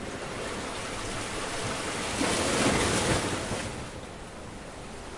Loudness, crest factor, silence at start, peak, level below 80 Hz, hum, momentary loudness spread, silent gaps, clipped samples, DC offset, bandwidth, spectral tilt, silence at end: -29 LUFS; 18 dB; 0 s; -12 dBFS; -46 dBFS; none; 17 LU; none; under 0.1%; under 0.1%; 11.5 kHz; -3.5 dB/octave; 0 s